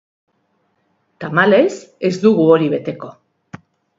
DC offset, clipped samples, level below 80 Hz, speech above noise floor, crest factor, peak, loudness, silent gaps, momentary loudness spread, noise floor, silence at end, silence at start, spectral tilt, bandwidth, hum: under 0.1%; under 0.1%; -62 dBFS; 50 dB; 18 dB; 0 dBFS; -15 LUFS; none; 19 LU; -65 dBFS; 0.85 s; 1.2 s; -6.5 dB/octave; 7.8 kHz; none